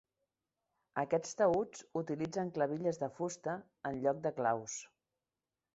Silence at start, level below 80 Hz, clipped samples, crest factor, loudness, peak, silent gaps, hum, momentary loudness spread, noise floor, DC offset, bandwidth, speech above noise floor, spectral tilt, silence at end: 0.95 s; -74 dBFS; under 0.1%; 20 dB; -37 LUFS; -18 dBFS; none; none; 10 LU; under -90 dBFS; under 0.1%; 8 kHz; over 54 dB; -6 dB/octave; 0.9 s